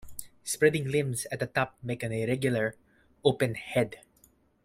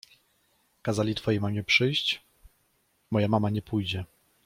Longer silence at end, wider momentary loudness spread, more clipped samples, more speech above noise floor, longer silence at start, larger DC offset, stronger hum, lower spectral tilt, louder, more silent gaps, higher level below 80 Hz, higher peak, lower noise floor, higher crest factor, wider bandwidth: first, 0.65 s vs 0.4 s; about the same, 10 LU vs 12 LU; neither; second, 35 dB vs 44 dB; second, 0 s vs 0.85 s; neither; neither; about the same, -5 dB/octave vs -5.5 dB/octave; about the same, -29 LUFS vs -27 LUFS; neither; about the same, -60 dBFS vs -60 dBFS; about the same, -8 dBFS vs -8 dBFS; second, -64 dBFS vs -70 dBFS; about the same, 22 dB vs 20 dB; about the same, 16 kHz vs 15.5 kHz